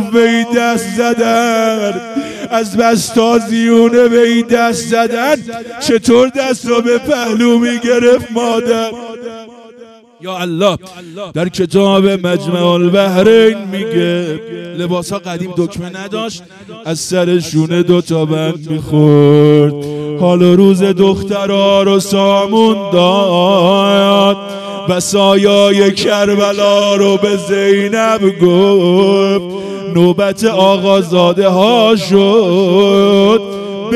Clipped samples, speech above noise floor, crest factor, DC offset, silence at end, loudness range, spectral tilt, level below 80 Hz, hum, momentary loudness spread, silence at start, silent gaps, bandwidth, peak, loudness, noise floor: 0.9%; 27 dB; 10 dB; under 0.1%; 0 s; 6 LU; -5.5 dB/octave; -50 dBFS; none; 12 LU; 0 s; none; 14 kHz; 0 dBFS; -11 LUFS; -38 dBFS